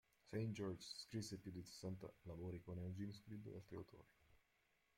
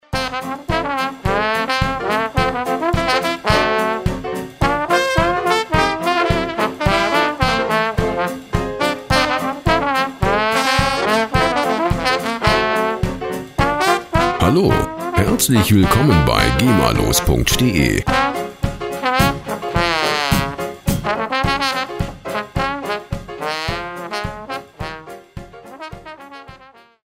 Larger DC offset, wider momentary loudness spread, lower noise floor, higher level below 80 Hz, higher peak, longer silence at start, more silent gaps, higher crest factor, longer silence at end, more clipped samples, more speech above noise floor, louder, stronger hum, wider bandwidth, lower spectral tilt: neither; about the same, 9 LU vs 11 LU; first, -83 dBFS vs -45 dBFS; second, -76 dBFS vs -30 dBFS; second, -34 dBFS vs 0 dBFS; first, 0.25 s vs 0.1 s; neither; about the same, 18 dB vs 18 dB; first, 0.6 s vs 0.4 s; neither; about the same, 31 dB vs 30 dB; second, -52 LUFS vs -17 LUFS; neither; about the same, 16.5 kHz vs 16 kHz; first, -6 dB/octave vs -4.5 dB/octave